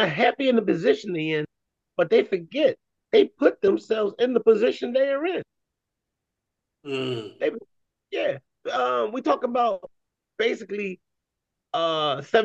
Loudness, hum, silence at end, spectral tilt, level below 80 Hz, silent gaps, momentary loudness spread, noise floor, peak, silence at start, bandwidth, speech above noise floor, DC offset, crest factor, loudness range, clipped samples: -24 LUFS; none; 0 s; -6 dB/octave; -74 dBFS; none; 12 LU; -84 dBFS; -6 dBFS; 0 s; 8 kHz; 61 dB; under 0.1%; 18 dB; 8 LU; under 0.1%